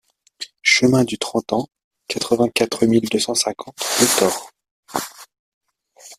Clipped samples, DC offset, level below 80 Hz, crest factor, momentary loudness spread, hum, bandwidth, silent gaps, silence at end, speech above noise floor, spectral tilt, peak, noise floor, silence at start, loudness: under 0.1%; under 0.1%; -58 dBFS; 20 dB; 14 LU; none; 16 kHz; 1.84-1.91 s, 4.71-4.83 s, 5.39-5.61 s; 0.05 s; 29 dB; -3 dB/octave; 0 dBFS; -47 dBFS; 0.4 s; -19 LUFS